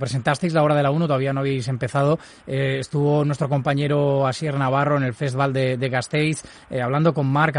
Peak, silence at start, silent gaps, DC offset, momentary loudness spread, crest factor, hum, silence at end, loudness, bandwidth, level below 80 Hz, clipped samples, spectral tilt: -4 dBFS; 0 s; none; under 0.1%; 5 LU; 16 dB; none; 0 s; -21 LUFS; 11 kHz; -56 dBFS; under 0.1%; -6.5 dB/octave